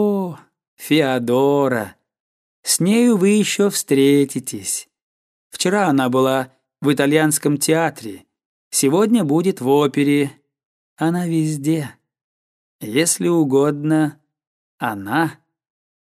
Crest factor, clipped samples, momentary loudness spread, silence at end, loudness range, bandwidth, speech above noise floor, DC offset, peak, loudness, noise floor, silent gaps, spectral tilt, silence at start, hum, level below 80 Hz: 18 dB; under 0.1%; 10 LU; 0.85 s; 3 LU; 15.5 kHz; over 73 dB; under 0.1%; -2 dBFS; -18 LUFS; under -90 dBFS; 0.68-0.77 s, 2.20-2.63 s, 5.02-5.51 s, 8.46-8.71 s, 10.65-10.97 s, 12.21-12.79 s, 14.47-14.78 s; -4.5 dB/octave; 0 s; none; -68 dBFS